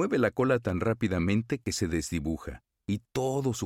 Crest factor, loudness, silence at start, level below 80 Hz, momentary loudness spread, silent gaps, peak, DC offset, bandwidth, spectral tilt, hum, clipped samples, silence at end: 16 dB; -29 LUFS; 0 s; -48 dBFS; 9 LU; none; -12 dBFS; under 0.1%; 16 kHz; -6 dB/octave; none; under 0.1%; 0 s